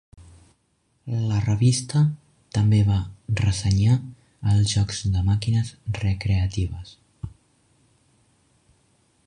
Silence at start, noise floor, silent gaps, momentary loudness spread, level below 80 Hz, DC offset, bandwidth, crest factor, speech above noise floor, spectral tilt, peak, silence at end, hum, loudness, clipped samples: 0.2 s; -68 dBFS; none; 20 LU; -38 dBFS; under 0.1%; 11 kHz; 16 dB; 47 dB; -6 dB/octave; -8 dBFS; 2 s; none; -23 LUFS; under 0.1%